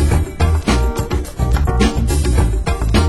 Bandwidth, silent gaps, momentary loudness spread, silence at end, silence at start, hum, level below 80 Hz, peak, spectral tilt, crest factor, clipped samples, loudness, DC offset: 12.5 kHz; none; 4 LU; 0 s; 0 s; none; -16 dBFS; -2 dBFS; -6 dB/octave; 14 dB; under 0.1%; -17 LUFS; under 0.1%